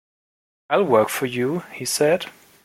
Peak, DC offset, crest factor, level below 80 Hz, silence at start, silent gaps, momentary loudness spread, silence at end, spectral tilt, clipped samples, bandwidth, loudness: -4 dBFS; under 0.1%; 20 dB; -66 dBFS; 0.7 s; none; 8 LU; 0.35 s; -4 dB/octave; under 0.1%; 16.5 kHz; -21 LUFS